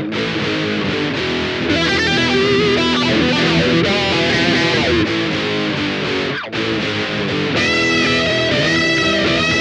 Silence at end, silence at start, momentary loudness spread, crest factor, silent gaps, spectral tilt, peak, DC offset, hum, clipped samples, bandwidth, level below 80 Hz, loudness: 0 s; 0 s; 5 LU; 14 dB; none; -4.5 dB/octave; -2 dBFS; under 0.1%; none; under 0.1%; 10.5 kHz; -40 dBFS; -15 LUFS